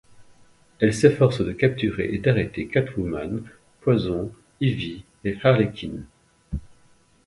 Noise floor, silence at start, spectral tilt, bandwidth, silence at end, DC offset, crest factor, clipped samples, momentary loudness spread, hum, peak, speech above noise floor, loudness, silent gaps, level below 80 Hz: -57 dBFS; 0.2 s; -7 dB/octave; 11.5 kHz; 0.6 s; under 0.1%; 22 dB; under 0.1%; 17 LU; none; -2 dBFS; 35 dB; -23 LUFS; none; -44 dBFS